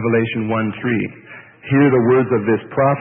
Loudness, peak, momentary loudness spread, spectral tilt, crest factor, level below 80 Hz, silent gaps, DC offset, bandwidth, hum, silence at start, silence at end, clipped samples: -17 LUFS; -2 dBFS; 11 LU; -13 dB/octave; 14 dB; -56 dBFS; none; under 0.1%; 3.7 kHz; none; 0 s; 0 s; under 0.1%